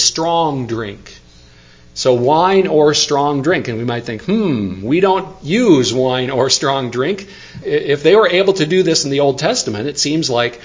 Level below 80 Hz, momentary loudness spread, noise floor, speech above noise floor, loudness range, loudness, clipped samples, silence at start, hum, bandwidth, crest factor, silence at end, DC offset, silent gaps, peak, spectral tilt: -48 dBFS; 9 LU; -43 dBFS; 29 dB; 1 LU; -14 LUFS; under 0.1%; 0 s; none; 7.6 kHz; 14 dB; 0.05 s; under 0.1%; none; 0 dBFS; -4 dB/octave